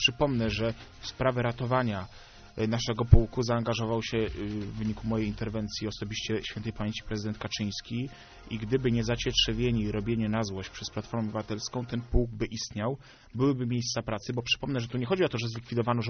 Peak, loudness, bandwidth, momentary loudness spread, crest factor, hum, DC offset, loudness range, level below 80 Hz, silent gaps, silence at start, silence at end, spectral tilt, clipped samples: -4 dBFS; -30 LUFS; 6.6 kHz; 10 LU; 26 dB; none; under 0.1%; 5 LU; -38 dBFS; none; 0 s; 0 s; -5 dB/octave; under 0.1%